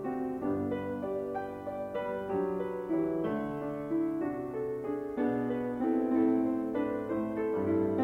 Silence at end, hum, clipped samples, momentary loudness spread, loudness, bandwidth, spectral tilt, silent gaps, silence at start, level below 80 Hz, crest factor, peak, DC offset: 0 s; none; under 0.1%; 7 LU; -33 LUFS; 4.3 kHz; -9 dB/octave; none; 0 s; -62 dBFS; 16 dB; -16 dBFS; under 0.1%